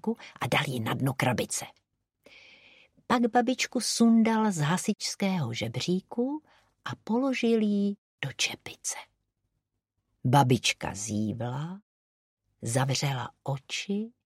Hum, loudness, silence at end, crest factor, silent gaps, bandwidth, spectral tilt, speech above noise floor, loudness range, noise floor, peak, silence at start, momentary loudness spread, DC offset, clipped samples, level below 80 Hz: none; -28 LUFS; 0.25 s; 22 dB; 7.98-8.18 s, 11.82-12.37 s; 15.5 kHz; -4.5 dB/octave; 54 dB; 5 LU; -82 dBFS; -8 dBFS; 0.05 s; 13 LU; under 0.1%; under 0.1%; -66 dBFS